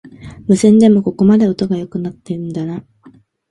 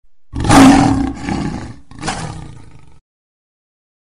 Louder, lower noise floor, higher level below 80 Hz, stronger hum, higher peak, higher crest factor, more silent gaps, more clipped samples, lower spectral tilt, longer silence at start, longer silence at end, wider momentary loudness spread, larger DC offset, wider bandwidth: about the same, -14 LUFS vs -12 LUFS; first, -46 dBFS vs -40 dBFS; second, -48 dBFS vs -30 dBFS; neither; about the same, 0 dBFS vs 0 dBFS; about the same, 14 dB vs 16 dB; neither; neither; first, -7.5 dB/octave vs -5 dB/octave; second, 0.05 s vs 0.35 s; second, 0.7 s vs 1.5 s; second, 16 LU vs 23 LU; second, under 0.1% vs 1%; second, 11.5 kHz vs 14.5 kHz